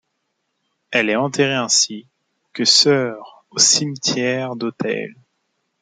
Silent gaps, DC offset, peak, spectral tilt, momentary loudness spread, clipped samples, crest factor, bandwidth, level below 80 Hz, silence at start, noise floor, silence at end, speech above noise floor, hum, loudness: none; under 0.1%; 0 dBFS; -2 dB/octave; 15 LU; under 0.1%; 20 dB; 11.5 kHz; -68 dBFS; 0.9 s; -73 dBFS; 0.7 s; 55 dB; none; -17 LUFS